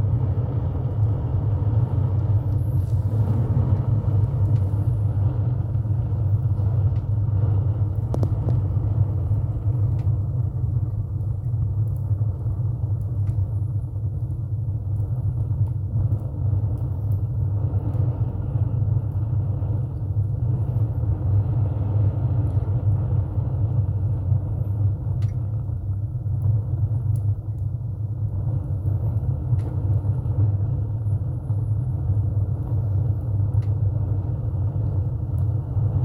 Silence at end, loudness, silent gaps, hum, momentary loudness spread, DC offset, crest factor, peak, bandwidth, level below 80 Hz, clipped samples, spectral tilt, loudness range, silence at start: 0 s; -24 LUFS; none; none; 4 LU; under 0.1%; 14 dB; -8 dBFS; 1.7 kHz; -34 dBFS; under 0.1%; -11.5 dB/octave; 3 LU; 0 s